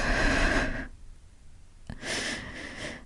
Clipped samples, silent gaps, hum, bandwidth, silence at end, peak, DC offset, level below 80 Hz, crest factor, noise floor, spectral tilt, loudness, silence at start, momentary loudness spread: under 0.1%; none; none; 11.5 kHz; 0 s; -12 dBFS; under 0.1%; -36 dBFS; 18 dB; -49 dBFS; -3.5 dB/octave; -30 LUFS; 0 s; 15 LU